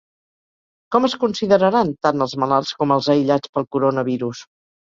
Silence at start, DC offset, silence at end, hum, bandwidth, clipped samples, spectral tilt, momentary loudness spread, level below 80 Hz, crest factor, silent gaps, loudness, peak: 0.9 s; under 0.1%; 0.5 s; none; 7.6 kHz; under 0.1%; -6 dB/octave; 7 LU; -60 dBFS; 18 dB; 3.49-3.53 s; -19 LUFS; -2 dBFS